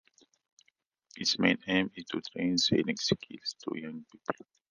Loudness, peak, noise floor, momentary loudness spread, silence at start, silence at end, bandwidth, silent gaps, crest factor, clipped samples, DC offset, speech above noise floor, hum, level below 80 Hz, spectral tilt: -31 LUFS; -10 dBFS; -72 dBFS; 13 LU; 1.15 s; 0.4 s; 10 kHz; none; 24 dB; under 0.1%; under 0.1%; 41 dB; none; -66 dBFS; -3.5 dB/octave